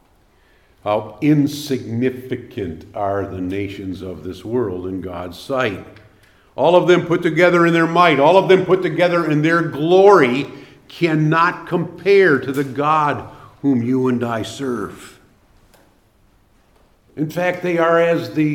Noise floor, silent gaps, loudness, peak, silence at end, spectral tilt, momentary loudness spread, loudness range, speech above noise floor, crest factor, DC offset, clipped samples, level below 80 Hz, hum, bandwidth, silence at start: -55 dBFS; none; -17 LUFS; 0 dBFS; 0 s; -6.5 dB/octave; 16 LU; 11 LU; 39 dB; 18 dB; under 0.1%; under 0.1%; -56 dBFS; none; 16 kHz; 0.85 s